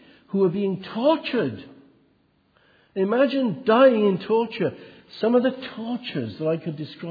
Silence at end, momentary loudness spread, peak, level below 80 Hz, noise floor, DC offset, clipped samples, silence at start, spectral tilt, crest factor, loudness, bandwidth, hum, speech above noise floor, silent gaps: 0 s; 15 LU; -6 dBFS; -70 dBFS; -64 dBFS; under 0.1%; under 0.1%; 0.35 s; -9 dB/octave; 18 dB; -23 LUFS; 5 kHz; none; 41 dB; none